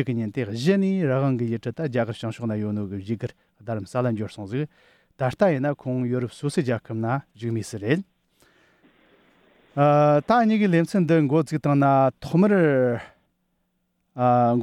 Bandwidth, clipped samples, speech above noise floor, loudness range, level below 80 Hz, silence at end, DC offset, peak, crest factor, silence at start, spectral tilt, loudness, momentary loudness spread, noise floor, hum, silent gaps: 12.5 kHz; under 0.1%; 50 dB; 9 LU; -62 dBFS; 0 s; under 0.1%; -6 dBFS; 16 dB; 0 s; -8 dB/octave; -23 LUFS; 12 LU; -72 dBFS; none; none